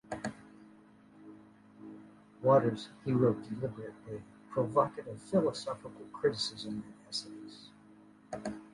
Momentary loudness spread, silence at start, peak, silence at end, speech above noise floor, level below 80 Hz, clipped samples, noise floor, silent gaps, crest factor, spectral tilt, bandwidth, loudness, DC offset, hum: 24 LU; 0.1 s; -14 dBFS; 0.05 s; 26 dB; -68 dBFS; under 0.1%; -59 dBFS; none; 22 dB; -6 dB/octave; 11.5 kHz; -34 LUFS; under 0.1%; none